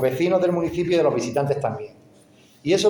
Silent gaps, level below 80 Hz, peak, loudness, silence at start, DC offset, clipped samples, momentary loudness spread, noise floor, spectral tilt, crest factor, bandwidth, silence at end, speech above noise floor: none; -56 dBFS; -8 dBFS; -22 LUFS; 0 s; under 0.1%; under 0.1%; 12 LU; -53 dBFS; -5.5 dB/octave; 14 dB; over 20 kHz; 0 s; 31 dB